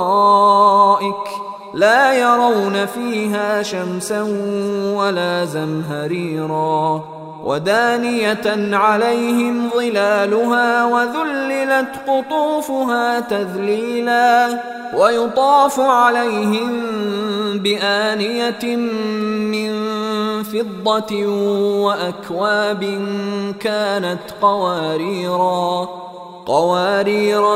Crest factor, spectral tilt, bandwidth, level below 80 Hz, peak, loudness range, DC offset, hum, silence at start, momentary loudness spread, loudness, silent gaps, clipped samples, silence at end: 16 dB; -4.5 dB/octave; 16 kHz; -64 dBFS; 0 dBFS; 5 LU; under 0.1%; none; 0 s; 9 LU; -17 LUFS; none; under 0.1%; 0 s